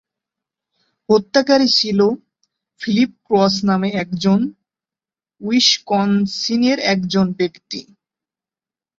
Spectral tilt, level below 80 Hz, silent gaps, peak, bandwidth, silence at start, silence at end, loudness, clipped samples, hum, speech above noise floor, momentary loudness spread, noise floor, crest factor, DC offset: -4.5 dB/octave; -58 dBFS; none; -2 dBFS; 7.8 kHz; 1.1 s; 1.15 s; -16 LUFS; under 0.1%; none; over 74 dB; 13 LU; under -90 dBFS; 18 dB; under 0.1%